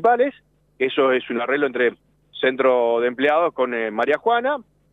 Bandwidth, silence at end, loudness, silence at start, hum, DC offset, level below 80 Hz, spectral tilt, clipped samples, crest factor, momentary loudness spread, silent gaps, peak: 4.5 kHz; 0.3 s; -20 LUFS; 0 s; none; under 0.1%; -66 dBFS; -6 dB/octave; under 0.1%; 14 dB; 5 LU; none; -6 dBFS